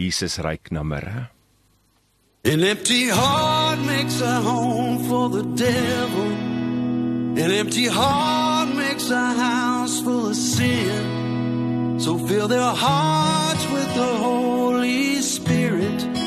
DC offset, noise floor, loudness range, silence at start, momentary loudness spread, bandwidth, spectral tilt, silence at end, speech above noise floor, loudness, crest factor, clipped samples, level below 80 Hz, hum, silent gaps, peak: under 0.1%; -63 dBFS; 2 LU; 0 s; 6 LU; 13 kHz; -4.5 dB/octave; 0 s; 42 dB; -21 LUFS; 16 dB; under 0.1%; -50 dBFS; none; none; -6 dBFS